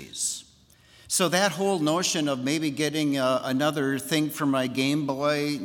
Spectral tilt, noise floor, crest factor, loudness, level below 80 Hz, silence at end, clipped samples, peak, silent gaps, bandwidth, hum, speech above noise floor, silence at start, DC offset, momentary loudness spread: -3.5 dB/octave; -57 dBFS; 20 dB; -25 LUFS; -66 dBFS; 0 s; under 0.1%; -6 dBFS; none; 18 kHz; none; 32 dB; 0 s; under 0.1%; 5 LU